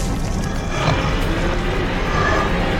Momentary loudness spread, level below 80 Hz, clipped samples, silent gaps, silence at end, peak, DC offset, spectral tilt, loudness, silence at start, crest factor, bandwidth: 5 LU; -24 dBFS; under 0.1%; none; 0 s; -4 dBFS; under 0.1%; -5.5 dB/octave; -20 LUFS; 0 s; 14 dB; 15 kHz